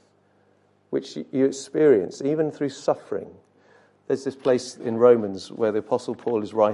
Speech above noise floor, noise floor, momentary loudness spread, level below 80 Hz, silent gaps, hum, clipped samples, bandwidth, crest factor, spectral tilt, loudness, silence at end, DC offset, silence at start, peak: 39 dB; -62 dBFS; 12 LU; -68 dBFS; none; 50 Hz at -60 dBFS; under 0.1%; 11.5 kHz; 20 dB; -6 dB/octave; -24 LUFS; 0 s; under 0.1%; 0.9 s; -4 dBFS